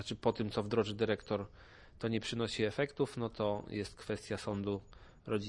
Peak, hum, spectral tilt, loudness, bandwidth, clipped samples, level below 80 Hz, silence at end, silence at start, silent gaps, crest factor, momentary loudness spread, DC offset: -16 dBFS; none; -6 dB/octave; -37 LUFS; 11.5 kHz; under 0.1%; -60 dBFS; 0 s; 0 s; none; 22 dB; 7 LU; under 0.1%